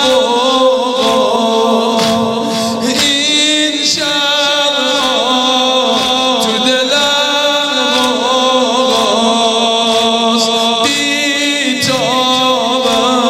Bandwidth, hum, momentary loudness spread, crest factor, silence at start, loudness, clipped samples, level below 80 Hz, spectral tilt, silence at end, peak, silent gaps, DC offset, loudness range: 16 kHz; none; 2 LU; 12 dB; 0 s; -11 LUFS; under 0.1%; -52 dBFS; -2 dB/octave; 0 s; 0 dBFS; none; under 0.1%; 1 LU